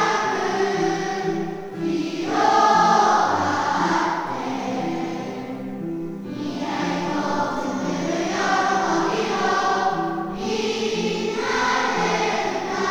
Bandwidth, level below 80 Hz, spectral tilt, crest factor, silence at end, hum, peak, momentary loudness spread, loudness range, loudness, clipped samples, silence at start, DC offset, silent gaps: over 20 kHz; -54 dBFS; -4 dB/octave; 16 dB; 0 s; none; -6 dBFS; 12 LU; 7 LU; -22 LUFS; under 0.1%; 0 s; under 0.1%; none